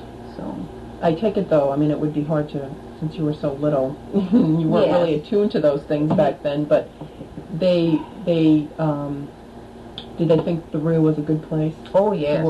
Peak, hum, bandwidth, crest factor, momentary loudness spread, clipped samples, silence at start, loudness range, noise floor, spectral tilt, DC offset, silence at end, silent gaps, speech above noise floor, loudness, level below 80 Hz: -4 dBFS; none; 8.8 kHz; 16 dB; 17 LU; under 0.1%; 0 s; 3 LU; -39 dBFS; -9 dB/octave; under 0.1%; 0 s; none; 19 dB; -20 LUFS; -48 dBFS